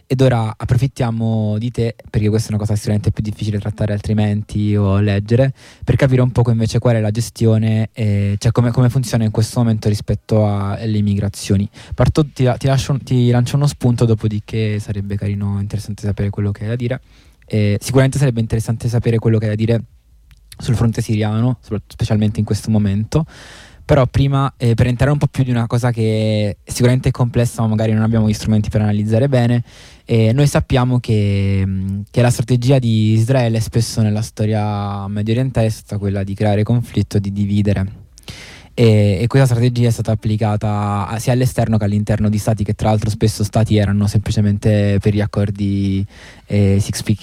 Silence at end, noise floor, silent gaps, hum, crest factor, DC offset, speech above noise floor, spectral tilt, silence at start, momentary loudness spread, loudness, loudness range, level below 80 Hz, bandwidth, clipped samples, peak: 0.05 s; -47 dBFS; none; none; 12 dB; under 0.1%; 32 dB; -7 dB/octave; 0.1 s; 7 LU; -17 LUFS; 3 LU; -36 dBFS; 14.5 kHz; under 0.1%; -4 dBFS